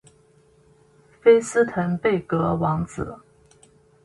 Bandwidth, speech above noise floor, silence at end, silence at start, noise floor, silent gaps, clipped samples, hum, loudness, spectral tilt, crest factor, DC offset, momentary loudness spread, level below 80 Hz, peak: 11.5 kHz; 36 dB; 0.9 s; 1.25 s; -57 dBFS; none; under 0.1%; none; -21 LUFS; -6.5 dB/octave; 20 dB; under 0.1%; 13 LU; -50 dBFS; -4 dBFS